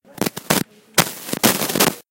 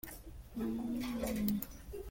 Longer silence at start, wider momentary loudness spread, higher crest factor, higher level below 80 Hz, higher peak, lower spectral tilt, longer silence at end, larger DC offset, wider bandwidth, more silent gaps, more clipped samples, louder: first, 0.2 s vs 0.05 s; second, 7 LU vs 13 LU; about the same, 20 dB vs 22 dB; about the same, -54 dBFS vs -52 dBFS; first, 0 dBFS vs -18 dBFS; second, -2.5 dB/octave vs -5.5 dB/octave; about the same, 0.1 s vs 0 s; neither; first, over 20 kHz vs 17 kHz; neither; neither; first, -19 LUFS vs -39 LUFS